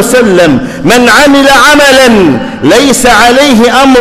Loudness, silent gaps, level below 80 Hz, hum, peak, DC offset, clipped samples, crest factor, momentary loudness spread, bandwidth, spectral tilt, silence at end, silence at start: -3 LUFS; none; -28 dBFS; none; 0 dBFS; under 0.1%; 4%; 4 dB; 5 LU; 18 kHz; -3.5 dB/octave; 0 s; 0 s